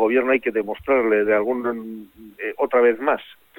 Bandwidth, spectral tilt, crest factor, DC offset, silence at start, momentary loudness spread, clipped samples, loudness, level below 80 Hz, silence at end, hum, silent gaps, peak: 17 kHz; -7 dB/octave; 16 dB; under 0.1%; 0 s; 13 LU; under 0.1%; -20 LUFS; -58 dBFS; 0.25 s; none; none; -6 dBFS